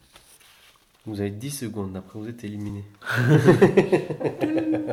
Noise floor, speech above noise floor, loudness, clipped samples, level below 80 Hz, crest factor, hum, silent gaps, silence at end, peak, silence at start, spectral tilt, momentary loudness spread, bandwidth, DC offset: -56 dBFS; 34 dB; -22 LUFS; under 0.1%; -58 dBFS; 20 dB; none; none; 0 s; -4 dBFS; 1.05 s; -7 dB/octave; 18 LU; 15.5 kHz; under 0.1%